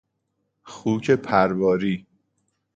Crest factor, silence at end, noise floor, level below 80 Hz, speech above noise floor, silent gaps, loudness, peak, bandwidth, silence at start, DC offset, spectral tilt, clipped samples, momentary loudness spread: 22 dB; 0.75 s; -75 dBFS; -58 dBFS; 54 dB; none; -22 LUFS; -2 dBFS; 8 kHz; 0.65 s; under 0.1%; -7 dB/octave; under 0.1%; 10 LU